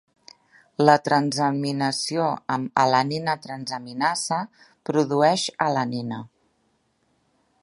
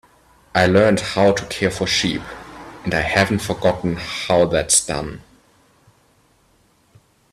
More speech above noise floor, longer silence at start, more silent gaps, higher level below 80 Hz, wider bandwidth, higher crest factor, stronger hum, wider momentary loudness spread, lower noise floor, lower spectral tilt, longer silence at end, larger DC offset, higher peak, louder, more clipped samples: first, 46 dB vs 40 dB; first, 0.8 s vs 0.55 s; neither; second, -70 dBFS vs -44 dBFS; second, 11.5 kHz vs 14 kHz; about the same, 24 dB vs 20 dB; neither; second, 12 LU vs 15 LU; first, -68 dBFS vs -58 dBFS; about the same, -4.5 dB/octave vs -3.5 dB/octave; second, 1.35 s vs 2.15 s; neither; about the same, 0 dBFS vs 0 dBFS; second, -23 LUFS vs -18 LUFS; neither